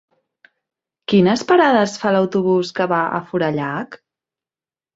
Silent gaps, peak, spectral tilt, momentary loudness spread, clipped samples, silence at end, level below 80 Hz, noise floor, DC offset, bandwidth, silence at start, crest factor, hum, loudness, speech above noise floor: none; 0 dBFS; -6 dB/octave; 11 LU; under 0.1%; 1 s; -60 dBFS; under -90 dBFS; under 0.1%; 8 kHz; 1.1 s; 18 dB; none; -17 LUFS; over 73 dB